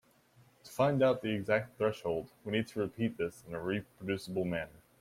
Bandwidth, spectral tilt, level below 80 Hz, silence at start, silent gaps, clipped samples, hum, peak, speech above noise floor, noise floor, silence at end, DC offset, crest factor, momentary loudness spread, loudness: 16 kHz; -6.5 dB/octave; -66 dBFS; 0.65 s; none; under 0.1%; none; -16 dBFS; 31 dB; -65 dBFS; 0.3 s; under 0.1%; 18 dB; 10 LU; -34 LUFS